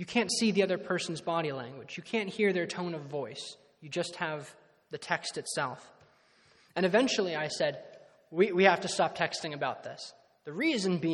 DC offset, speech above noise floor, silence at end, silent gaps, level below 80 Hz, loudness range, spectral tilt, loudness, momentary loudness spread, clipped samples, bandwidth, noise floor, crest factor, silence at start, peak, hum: under 0.1%; 33 dB; 0 s; none; -76 dBFS; 8 LU; -4 dB/octave; -31 LUFS; 17 LU; under 0.1%; 12 kHz; -64 dBFS; 26 dB; 0 s; -6 dBFS; none